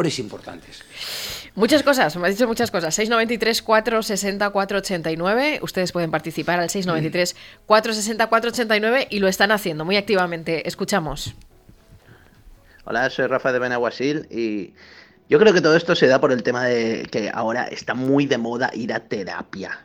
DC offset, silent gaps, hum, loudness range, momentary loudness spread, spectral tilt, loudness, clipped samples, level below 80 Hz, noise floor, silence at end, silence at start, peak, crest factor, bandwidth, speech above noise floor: under 0.1%; none; none; 6 LU; 12 LU; -4 dB/octave; -20 LUFS; under 0.1%; -52 dBFS; -50 dBFS; 0.05 s; 0 s; -2 dBFS; 20 dB; 17.5 kHz; 29 dB